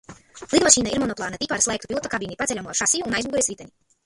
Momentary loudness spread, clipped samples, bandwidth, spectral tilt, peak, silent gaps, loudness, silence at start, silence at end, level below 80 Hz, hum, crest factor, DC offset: 12 LU; under 0.1%; 15 kHz; -2 dB/octave; 0 dBFS; none; -21 LUFS; 0.1 s; 0.4 s; -50 dBFS; none; 24 dB; under 0.1%